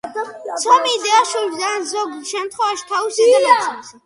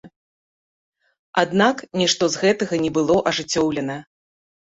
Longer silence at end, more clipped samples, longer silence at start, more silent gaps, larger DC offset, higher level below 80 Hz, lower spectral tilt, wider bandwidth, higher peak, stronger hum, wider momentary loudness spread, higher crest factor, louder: second, 0.15 s vs 0.65 s; neither; about the same, 0.05 s vs 0.05 s; second, none vs 0.16-0.92 s, 1.19-1.33 s; neither; second, -68 dBFS vs -56 dBFS; second, 0 dB/octave vs -4 dB/octave; first, 11.5 kHz vs 8 kHz; about the same, 0 dBFS vs -2 dBFS; neither; first, 12 LU vs 7 LU; about the same, 16 dB vs 20 dB; first, -17 LUFS vs -20 LUFS